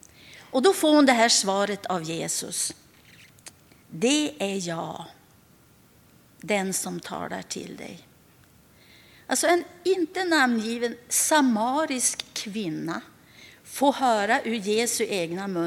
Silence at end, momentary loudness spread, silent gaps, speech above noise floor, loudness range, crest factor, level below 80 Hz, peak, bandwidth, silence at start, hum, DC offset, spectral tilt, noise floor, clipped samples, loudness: 0 s; 15 LU; none; 32 dB; 10 LU; 20 dB; -68 dBFS; -6 dBFS; 18.5 kHz; 0.25 s; none; under 0.1%; -2.5 dB/octave; -57 dBFS; under 0.1%; -24 LUFS